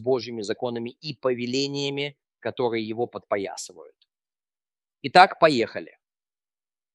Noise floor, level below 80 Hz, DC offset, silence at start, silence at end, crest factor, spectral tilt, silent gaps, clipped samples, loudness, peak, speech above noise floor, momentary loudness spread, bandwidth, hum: under -90 dBFS; -74 dBFS; under 0.1%; 0 s; 1.1 s; 24 dB; -4.5 dB/octave; none; under 0.1%; -24 LUFS; -2 dBFS; over 66 dB; 18 LU; 12 kHz; none